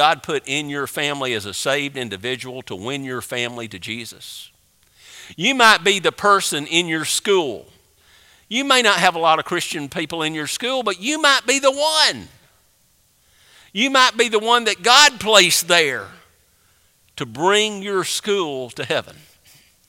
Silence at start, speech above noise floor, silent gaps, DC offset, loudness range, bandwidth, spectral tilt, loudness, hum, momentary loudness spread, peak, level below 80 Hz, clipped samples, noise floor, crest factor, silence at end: 0 s; 40 dB; none; under 0.1%; 9 LU; 16.5 kHz; -2 dB/octave; -17 LUFS; none; 17 LU; 0 dBFS; -62 dBFS; under 0.1%; -59 dBFS; 20 dB; 0.75 s